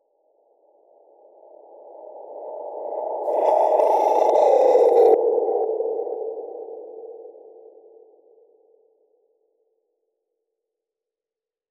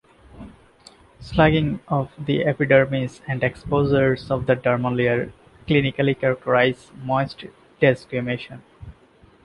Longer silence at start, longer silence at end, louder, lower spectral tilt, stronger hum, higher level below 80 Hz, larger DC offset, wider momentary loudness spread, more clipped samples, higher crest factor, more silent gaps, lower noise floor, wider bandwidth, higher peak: first, 1.85 s vs 0.35 s; first, 4.4 s vs 0.55 s; about the same, -19 LUFS vs -21 LUFS; second, -4 dB/octave vs -8 dB/octave; neither; second, -88 dBFS vs -46 dBFS; neither; first, 24 LU vs 12 LU; neither; about the same, 18 dB vs 18 dB; neither; first, under -90 dBFS vs -53 dBFS; about the same, 12 kHz vs 11 kHz; about the same, -4 dBFS vs -4 dBFS